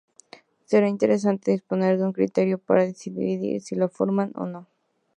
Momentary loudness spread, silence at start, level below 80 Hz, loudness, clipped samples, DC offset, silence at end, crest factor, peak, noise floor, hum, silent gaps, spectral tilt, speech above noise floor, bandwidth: 8 LU; 0.7 s; -72 dBFS; -24 LUFS; under 0.1%; under 0.1%; 0.55 s; 20 dB; -4 dBFS; -52 dBFS; none; none; -7.5 dB/octave; 29 dB; 9.4 kHz